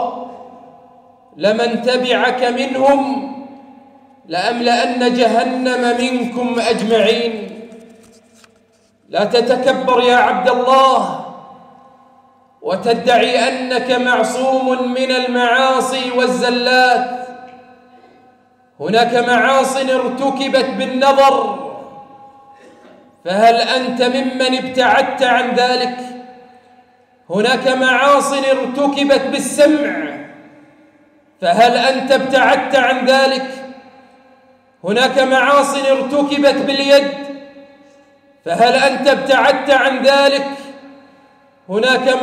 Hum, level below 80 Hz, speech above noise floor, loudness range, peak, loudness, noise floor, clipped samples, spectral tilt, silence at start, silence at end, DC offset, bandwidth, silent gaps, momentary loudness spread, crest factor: none; -60 dBFS; 41 dB; 3 LU; -2 dBFS; -14 LUFS; -55 dBFS; under 0.1%; -3.5 dB/octave; 0 s; 0 s; under 0.1%; 15 kHz; none; 14 LU; 12 dB